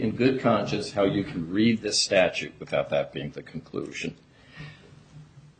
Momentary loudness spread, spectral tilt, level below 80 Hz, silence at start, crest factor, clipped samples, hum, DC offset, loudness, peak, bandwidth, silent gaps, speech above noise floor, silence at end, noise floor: 17 LU; -4.5 dB/octave; -58 dBFS; 0 s; 20 dB; under 0.1%; none; under 0.1%; -26 LUFS; -8 dBFS; 9.4 kHz; none; 24 dB; 0.2 s; -49 dBFS